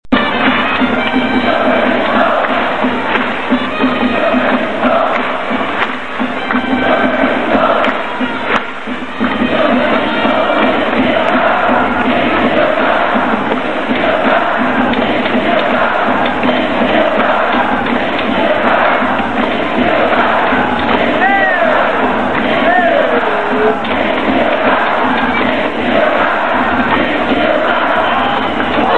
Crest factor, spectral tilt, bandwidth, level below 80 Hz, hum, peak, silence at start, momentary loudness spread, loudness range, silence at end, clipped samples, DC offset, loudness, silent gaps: 12 dB; -6 dB/octave; 9.4 kHz; -40 dBFS; none; 0 dBFS; 0.1 s; 4 LU; 2 LU; 0 s; under 0.1%; 5%; -12 LUFS; none